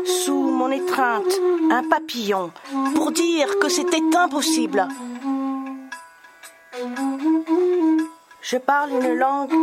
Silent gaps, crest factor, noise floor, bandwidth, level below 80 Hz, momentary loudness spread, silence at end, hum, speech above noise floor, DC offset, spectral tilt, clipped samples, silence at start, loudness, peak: none; 20 dB; -46 dBFS; 16 kHz; -76 dBFS; 12 LU; 0 s; none; 25 dB; under 0.1%; -2.5 dB/octave; under 0.1%; 0 s; -21 LUFS; -2 dBFS